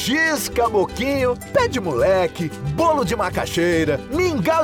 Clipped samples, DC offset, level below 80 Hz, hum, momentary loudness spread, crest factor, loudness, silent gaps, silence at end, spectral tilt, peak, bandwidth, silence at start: under 0.1%; under 0.1%; -40 dBFS; none; 4 LU; 14 dB; -20 LUFS; none; 0 s; -5 dB/octave; -6 dBFS; 19.5 kHz; 0 s